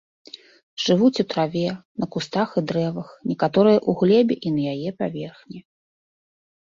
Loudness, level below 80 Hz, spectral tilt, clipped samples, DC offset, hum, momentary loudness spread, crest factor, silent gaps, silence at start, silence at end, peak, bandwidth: -22 LUFS; -62 dBFS; -6.5 dB/octave; under 0.1%; under 0.1%; none; 23 LU; 18 dB; 1.85-1.95 s; 0.8 s; 1.05 s; -4 dBFS; 7.6 kHz